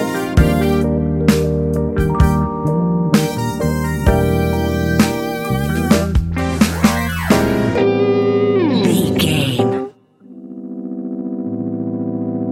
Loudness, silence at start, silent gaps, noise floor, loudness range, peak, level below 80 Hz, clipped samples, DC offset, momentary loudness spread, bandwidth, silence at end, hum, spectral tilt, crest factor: -16 LUFS; 0 s; none; -41 dBFS; 3 LU; -2 dBFS; -26 dBFS; under 0.1%; under 0.1%; 9 LU; 17 kHz; 0 s; none; -6.5 dB/octave; 14 dB